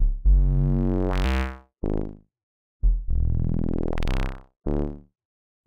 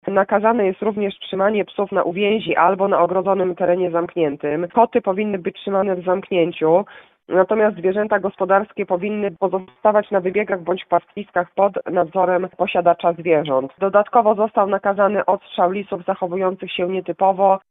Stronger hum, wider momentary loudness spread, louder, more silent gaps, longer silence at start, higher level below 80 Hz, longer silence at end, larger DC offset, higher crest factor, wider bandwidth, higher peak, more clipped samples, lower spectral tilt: neither; first, 11 LU vs 6 LU; second, -27 LUFS vs -19 LUFS; first, 2.43-2.80 s vs none; about the same, 0 s vs 0.05 s; first, -24 dBFS vs -62 dBFS; first, 0.65 s vs 0.15 s; neither; about the same, 14 dB vs 18 dB; first, 6.4 kHz vs 4 kHz; second, -10 dBFS vs 0 dBFS; neither; second, -8 dB/octave vs -9.5 dB/octave